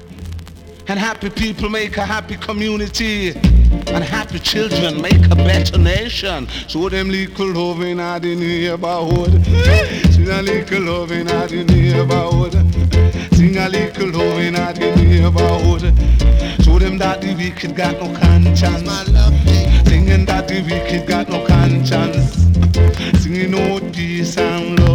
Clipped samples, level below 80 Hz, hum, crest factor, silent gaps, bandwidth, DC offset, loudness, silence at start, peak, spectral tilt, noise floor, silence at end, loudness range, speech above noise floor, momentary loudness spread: under 0.1%; -18 dBFS; none; 10 dB; none; 10.5 kHz; under 0.1%; -15 LUFS; 0 s; -2 dBFS; -6.5 dB/octave; -34 dBFS; 0 s; 4 LU; 21 dB; 8 LU